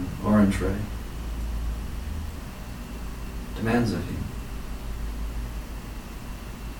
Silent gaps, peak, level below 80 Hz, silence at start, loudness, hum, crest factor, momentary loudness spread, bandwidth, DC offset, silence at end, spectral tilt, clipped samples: none; -8 dBFS; -34 dBFS; 0 s; -30 LUFS; none; 20 dB; 15 LU; 19 kHz; under 0.1%; 0 s; -6.5 dB/octave; under 0.1%